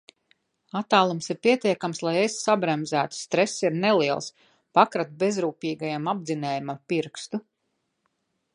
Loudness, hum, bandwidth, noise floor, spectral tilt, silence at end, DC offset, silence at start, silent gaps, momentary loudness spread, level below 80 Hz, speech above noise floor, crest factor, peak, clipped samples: -25 LUFS; none; 11.5 kHz; -77 dBFS; -4.5 dB/octave; 1.15 s; under 0.1%; 0.75 s; none; 10 LU; -76 dBFS; 52 dB; 22 dB; -4 dBFS; under 0.1%